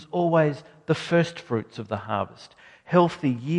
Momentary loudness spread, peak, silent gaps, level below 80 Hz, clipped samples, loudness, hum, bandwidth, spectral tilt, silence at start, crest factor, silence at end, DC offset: 11 LU; -6 dBFS; none; -60 dBFS; under 0.1%; -25 LUFS; none; 10.5 kHz; -7 dB/octave; 0 s; 20 dB; 0 s; under 0.1%